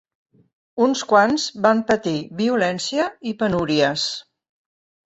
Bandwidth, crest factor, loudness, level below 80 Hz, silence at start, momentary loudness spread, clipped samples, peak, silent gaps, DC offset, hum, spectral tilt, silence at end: 8.2 kHz; 18 dB; -20 LUFS; -56 dBFS; 0.75 s; 9 LU; under 0.1%; -2 dBFS; none; under 0.1%; none; -4.5 dB/octave; 0.85 s